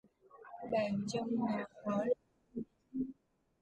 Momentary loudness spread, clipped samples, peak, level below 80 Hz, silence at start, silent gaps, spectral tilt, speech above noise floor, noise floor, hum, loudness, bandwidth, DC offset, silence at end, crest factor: 14 LU; under 0.1%; -22 dBFS; -74 dBFS; 0.35 s; none; -6.5 dB/octave; 32 dB; -68 dBFS; none; -38 LUFS; 11 kHz; under 0.1%; 0.5 s; 18 dB